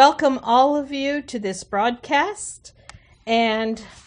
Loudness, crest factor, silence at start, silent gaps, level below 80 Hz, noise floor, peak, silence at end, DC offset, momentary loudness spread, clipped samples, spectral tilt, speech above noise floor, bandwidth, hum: -21 LUFS; 20 dB; 0 s; none; -56 dBFS; -47 dBFS; 0 dBFS; 0.2 s; under 0.1%; 14 LU; under 0.1%; -3.5 dB/octave; 26 dB; 10 kHz; none